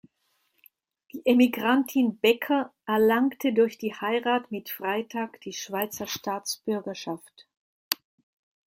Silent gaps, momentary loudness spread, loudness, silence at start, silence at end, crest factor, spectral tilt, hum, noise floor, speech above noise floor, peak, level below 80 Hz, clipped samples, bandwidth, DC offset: 7.57-7.91 s; 13 LU; -26 LUFS; 1.15 s; 0.75 s; 28 dB; -4 dB/octave; none; -73 dBFS; 47 dB; 0 dBFS; -74 dBFS; under 0.1%; 16.5 kHz; under 0.1%